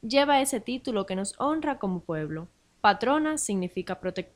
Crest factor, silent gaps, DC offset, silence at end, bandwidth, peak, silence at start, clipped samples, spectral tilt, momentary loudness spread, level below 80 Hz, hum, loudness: 20 dB; none; under 0.1%; 0.1 s; 16 kHz; -8 dBFS; 0.05 s; under 0.1%; -4 dB/octave; 10 LU; -60 dBFS; none; -27 LUFS